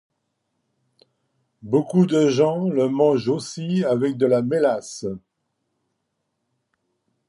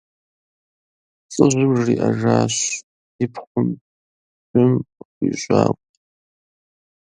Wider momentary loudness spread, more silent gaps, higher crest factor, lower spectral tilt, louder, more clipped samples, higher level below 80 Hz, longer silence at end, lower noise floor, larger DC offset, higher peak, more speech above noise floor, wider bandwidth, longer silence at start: about the same, 11 LU vs 12 LU; second, none vs 2.83-3.19 s, 3.47-3.55 s, 3.81-4.54 s, 5.05-5.21 s; about the same, 16 dB vs 20 dB; first, -7 dB/octave vs -5.5 dB/octave; about the same, -21 LUFS vs -19 LUFS; neither; second, -66 dBFS vs -56 dBFS; first, 2.1 s vs 1.25 s; second, -76 dBFS vs under -90 dBFS; neither; second, -6 dBFS vs 0 dBFS; second, 56 dB vs over 72 dB; first, 11.5 kHz vs 10 kHz; first, 1.65 s vs 1.3 s